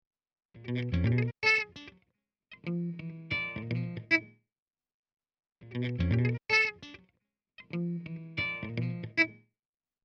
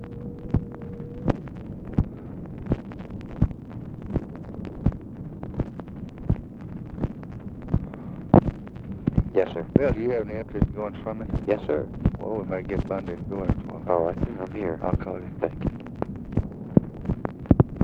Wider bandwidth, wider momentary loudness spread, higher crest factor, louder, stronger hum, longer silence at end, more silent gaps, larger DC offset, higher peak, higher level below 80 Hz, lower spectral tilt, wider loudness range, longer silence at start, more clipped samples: about the same, 6.8 kHz vs 6.4 kHz; about the same, 15 LU vs 14 LU; about the same, 22 dB vs 26 dB; second, -31 LUFS vs -28 LUFS; neither; first, 0.7 s vs 0 s; first, 4.62-4.66 s, 4.94-5.03 s, 5.52-5.56 s vs none; neither; second, -12 dBFS vs 0 dBFS; second, -54 dBFS vs -36 dBFS; second, -6 dB/octave vs -10.5 dB/octave; second, 4 LU vs 7 LU; first, 0.55 s vs 0 s; neither